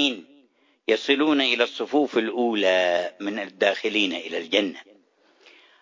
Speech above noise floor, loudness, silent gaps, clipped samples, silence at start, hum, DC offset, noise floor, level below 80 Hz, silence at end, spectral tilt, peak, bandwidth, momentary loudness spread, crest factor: 37 dB; -23 LUFS; none; under 0.1%; 0 s; none; under 0.1%; -60 dBFS; -78 dBFS; 1 s; -3.5 dB/octave; -4 dBFS; 7.6 kHz; 10 LU; 20 dB